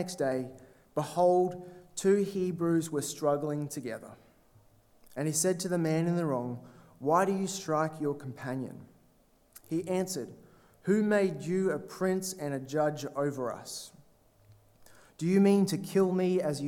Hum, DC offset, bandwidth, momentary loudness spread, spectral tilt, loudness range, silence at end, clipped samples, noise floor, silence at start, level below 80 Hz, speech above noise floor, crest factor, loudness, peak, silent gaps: none; under 0.1%; 17 kHz; 14 LU; -5.5 dB/octave; 5 LU; 0 s; under 0.1%; -65 dBFS; 0 s; -70 dBFS; 35 dB; 18 dB; -31 LUFS; -12 dBFS; none